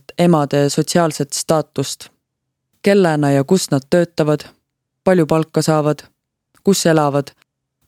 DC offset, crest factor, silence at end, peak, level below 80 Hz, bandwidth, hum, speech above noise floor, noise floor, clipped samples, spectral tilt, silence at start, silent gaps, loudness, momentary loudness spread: under 0.1%; 16 dB; 0.65 s; 0 dBFS; -56 dBFS; 16 kHz; none; 60 dB; -76 dBFS; under 0.1%; -5.5 dB/octave; 0.2 s; none; -16 LUFS; 9 LU